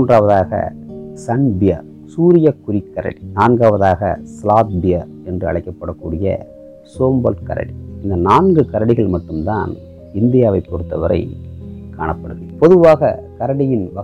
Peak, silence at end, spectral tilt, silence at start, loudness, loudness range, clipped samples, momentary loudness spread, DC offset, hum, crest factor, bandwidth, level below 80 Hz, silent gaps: 0 dBFS; 0 s; -9 dB/octave; 0 s; -15 LUFS; 4 LU; under 0.1%; 16 LU; under 0.1%; none; 14 dB; 9.8 kHz; -38 dBFS; none